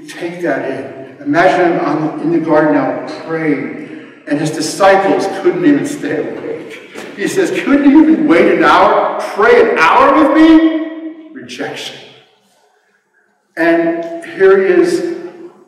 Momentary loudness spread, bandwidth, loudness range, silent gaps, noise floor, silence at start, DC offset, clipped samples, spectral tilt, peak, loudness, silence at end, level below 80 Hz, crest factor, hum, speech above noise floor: 19 LU; 13 kHz; 7 LU; none; -57 dBFS; 0 s; under 0.1%; under 0.1%; -5.5 dB/octave; 0 dBFS; -11 LUFS; 0.2 s; -50 dBFS; 12 dB; none; 46 dB